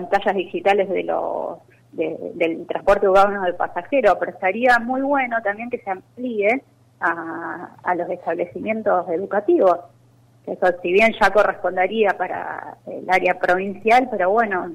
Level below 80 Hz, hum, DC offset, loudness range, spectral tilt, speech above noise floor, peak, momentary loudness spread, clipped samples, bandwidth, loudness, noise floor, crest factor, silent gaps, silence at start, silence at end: -50 dBFS; none; under 0.1%; 5 LU; -5.5 dB/octave; 34 dB; -6 dBFS; 12 LU; under 0.1%; 15 kHz; -20 LUFS; -53 dBFS; 14 dB; none; 0 s; 0 s